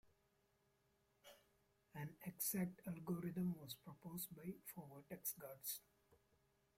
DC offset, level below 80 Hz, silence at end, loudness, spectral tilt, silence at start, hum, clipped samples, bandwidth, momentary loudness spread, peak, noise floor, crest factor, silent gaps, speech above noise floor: under 0.1%; -82 dBFS; 0.6 s; -49 LUFS; -5 dB/octave; 0.05 s; none; under 0.1%; 16.5 kHz; 15 LU; -30 dBFS; -82 dBFS; 22 dB; none; 33 dB